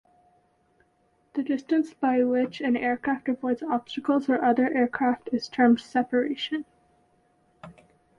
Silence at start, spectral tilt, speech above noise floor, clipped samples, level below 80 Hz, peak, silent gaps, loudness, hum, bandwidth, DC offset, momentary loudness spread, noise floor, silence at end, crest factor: 1.35 s; -5.5 dB/octave; 42 dB; under 0.1%; -68 dBFS; -10 dBFS; none; -26 LUFS; none; 7.4 kHz; under 0.1%; 8 LU; -67 dBFS; 0.45 s; 18 dB